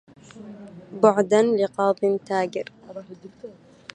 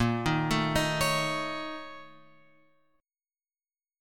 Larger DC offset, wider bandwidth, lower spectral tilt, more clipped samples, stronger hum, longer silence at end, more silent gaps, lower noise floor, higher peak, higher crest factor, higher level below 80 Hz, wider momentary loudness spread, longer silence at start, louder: neither; second, 9.4 kHz vs 17.5 kHz; first, -6 dB/octave vs -4.5 dB/octave; neither; neither; second, 0.45 s vs 1.9 s; neither; second, -44 dBFS vs under -90 dBFS; first, -2 dBFS vs -12 dBFS; about the same, 22 dB vs 20 dB; second, -70 dBFS vs -50 dBFS; first, 24 LU vs 15 LU; first, 0.35 s vs 0 s; first, -21 LUFS vs -28 LUFS